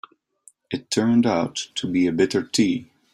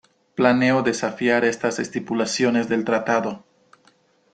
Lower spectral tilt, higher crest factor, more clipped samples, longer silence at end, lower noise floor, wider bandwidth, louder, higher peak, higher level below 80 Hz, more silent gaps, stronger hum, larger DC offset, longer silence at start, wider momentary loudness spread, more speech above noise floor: about the same, -4.5 dB/octave vs -4.5 dB/octave; about the same, 18 dB vs 20 dB; neither; second, 0.3 s vs 0.95 s; about the same, -56 dBFS vs -59 dBFS; first, 13 kHz vs 9.4 kHz; about the same, -22 LUFS vs -21 LUFS; second, -6 dBFS vs -2 dBFS; about the same, -60 dBFS vs -64 dBFS; neither; neither; neither; first, 0.7 s vs 0.35 s; about the same, 10 LU vs 9 LU; second, 35 dB vs 39 dB